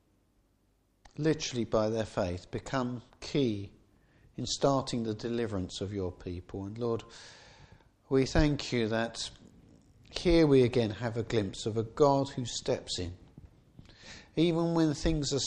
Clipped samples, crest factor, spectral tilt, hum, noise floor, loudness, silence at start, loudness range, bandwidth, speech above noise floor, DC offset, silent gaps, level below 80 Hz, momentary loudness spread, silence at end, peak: under 0.1%; 20 dB; -5.5 dB/octave; none; -71 dBFS; -31 LUFS; 1.2 s; 5 LU; 10 kHz; 41 dB; under 0.1%; none; -46 dBFS; 15 LU; 0 s; -12 dBFS